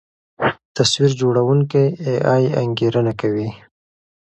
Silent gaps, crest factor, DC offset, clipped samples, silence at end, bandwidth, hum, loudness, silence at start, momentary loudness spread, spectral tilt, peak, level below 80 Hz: 0.65-0.75 s; 18 dB; under 0.1%; under 0.1%; 0.8 s; 8.8 kHz; none; -18 LUFS; 0.4 s; 6 LU; -5.5 dB/octave; 0 dBFS; -54 dBFS